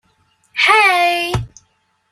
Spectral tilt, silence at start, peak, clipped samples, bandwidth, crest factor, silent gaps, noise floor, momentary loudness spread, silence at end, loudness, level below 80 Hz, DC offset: -3.5 dB/octave; 0.55 s; 0 dBFS; under 0.1%; 15 kHz; 18 dB; none; -62 dBFS; 16 LU; 0.65 s; -13 LUFS; -40 dBFS; under 0.1%